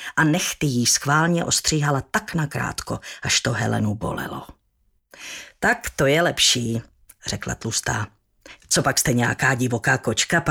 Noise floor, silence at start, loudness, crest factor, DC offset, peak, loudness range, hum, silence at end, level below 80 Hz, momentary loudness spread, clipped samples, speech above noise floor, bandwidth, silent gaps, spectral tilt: -66 dBFS; 0 s; -21 LUFS; 18 dB; under 0.1%; -4 dBFS; 4 LU; none; 0 s; -48 dBFS; 13 LU; under 0.1%; 44 dB; 18.5 kHz; none; -3.5 dB/octave